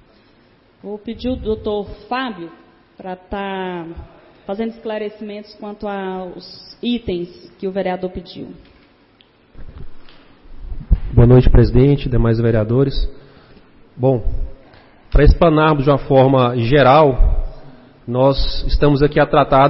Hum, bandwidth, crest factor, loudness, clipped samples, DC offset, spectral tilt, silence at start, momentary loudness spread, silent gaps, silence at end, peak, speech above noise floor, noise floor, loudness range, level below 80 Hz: none; 5.8 kHz; 16 dB; -16 LUFS; under 0.1%; under 0.1%; -11.5 dB/octave; 0.85 s; 21 LU; none; 0 s; 0 dBFS; 37 dB; -52 dBFS; 13 LU; -22 dBFS